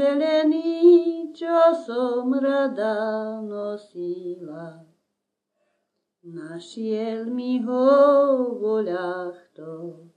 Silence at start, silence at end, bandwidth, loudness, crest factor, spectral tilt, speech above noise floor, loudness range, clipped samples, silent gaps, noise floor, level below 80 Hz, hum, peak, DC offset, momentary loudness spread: 0 s; 0.2 s; 9.2 kHz; -22 LUFS; 16 dB; -6.5 dB/octave; 58 dB; 14 LU; under 0.1%; none; -80 dBFS; -86 dBFS; none; -6 dBFS; under 0.1%; 21 LU